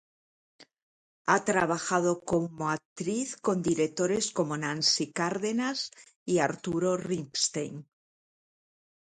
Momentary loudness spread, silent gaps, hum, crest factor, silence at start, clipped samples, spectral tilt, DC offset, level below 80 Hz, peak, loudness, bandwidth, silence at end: 8 LU; 0.83-1.25 s, 2.85-2.96 s, 6.16-6.26 s; none; 22 dB; 0.6 s; under 0.1%; -3.5 dB/octave; under 0.1%; -66 dBFS; -8 dBFS; -29 LUFS; 11 kHz; 1.25 s